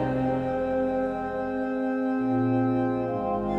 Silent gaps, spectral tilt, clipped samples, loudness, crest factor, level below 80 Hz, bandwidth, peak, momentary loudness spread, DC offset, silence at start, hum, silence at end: none; -9.5 dB/octave; under 0.1%; -27 LUFS; 12 dB; -50 dBFS; 5.6 kHz; -14 dBFS; 5 LU; under 0.1%; 0 s; none; 0 s